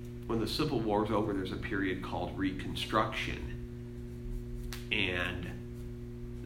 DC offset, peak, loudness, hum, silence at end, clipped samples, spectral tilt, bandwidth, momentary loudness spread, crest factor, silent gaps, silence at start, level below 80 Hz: under 0.1%; -14 dBFS; -35 LUFS; 60 Hz at -45 dBFS; 0 s; under 0.1%; -5.5 dB/octave; 16 kHz; 13 LU; 22 dB; none; 0 s; -46 dBFS